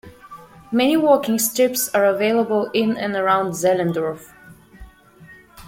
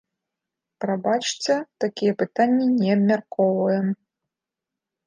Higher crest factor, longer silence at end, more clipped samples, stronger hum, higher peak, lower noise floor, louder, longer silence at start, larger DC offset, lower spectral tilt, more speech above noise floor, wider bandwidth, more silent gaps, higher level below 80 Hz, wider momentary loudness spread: about the same, 18 dB vs 16 dB; second, 0 s vs 1.1 s; neither; neither; first, -2 dBFS vs -6 dBFS; second, -46 dBFS vs -87 dBFS; first, -19 LUFS vs -22 LUFS; second, 0.05 s vs 0.8 s; neither; second, -4 dB/octave vs -5.5 dB/octave; second, 28 dB vs 65 dB; first, 16.5 kHz vs 9.8 kHz; neither; first, -54 dBFS vs -76 dBFS; about the same, 6 LU vs 8 LU